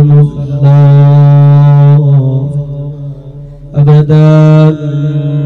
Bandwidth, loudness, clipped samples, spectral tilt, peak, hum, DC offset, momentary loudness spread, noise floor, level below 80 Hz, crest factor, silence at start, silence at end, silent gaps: 4.4 kHz; -6 LUFS; under 0.1%; -10.5 dB/octave; 0 dBFS; none; under 0.1%; 15 LU; -26 dBFS; -36 dBFS; 6 dB; 0 s; 0 s; none